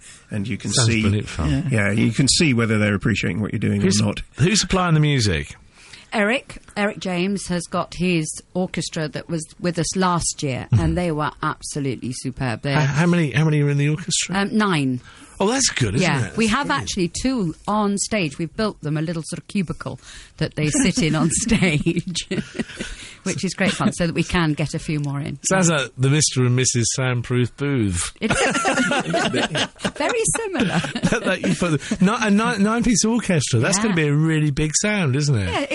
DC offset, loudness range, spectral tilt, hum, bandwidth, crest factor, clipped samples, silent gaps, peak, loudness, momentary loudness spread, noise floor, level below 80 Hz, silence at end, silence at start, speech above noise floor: under 0.1%; 4 LU; -4.5 dB/octave; none; 11.5 kHz; 18 dB; under 0.1%; none; -4 dBFS; -20 LUFS; 9 LU; -41 dBFS; -40 dBFS; 0 s; 0.05 s; 21 dB